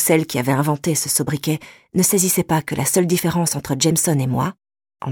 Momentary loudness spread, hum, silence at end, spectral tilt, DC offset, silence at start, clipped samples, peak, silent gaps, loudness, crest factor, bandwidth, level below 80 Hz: 7 LU; none; 0 s; -4.5 dB/octave; under 0.1%; 0 s; under 0.1%; -4 dBFS; none; -19 LUFS; 16 dB; 19 kHz; -52 dBFS